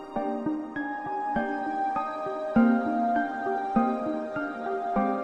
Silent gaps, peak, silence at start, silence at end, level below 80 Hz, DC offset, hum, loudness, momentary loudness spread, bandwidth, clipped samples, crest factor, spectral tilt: none; -10 dBFS; 0 s; 0 s; -58 dBFS; under 0.1%; none; -28 LUFS; 9 LU; 6.6 kHz; under 0.1%; 18 dB; -8 dB/octave